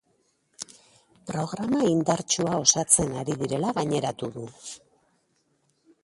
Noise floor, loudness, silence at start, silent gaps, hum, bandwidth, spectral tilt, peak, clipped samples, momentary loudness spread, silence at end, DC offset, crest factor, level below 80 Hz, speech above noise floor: -70 dBFS; -24 LUFS; 0.6 s; none; none; 11.5 kHz; -3.5 dB/octave; -4 dBFS; under 0.1%; 20 LU; 1.25 s; under 0.1%; 24 dB; -58 dBFS; 44 dB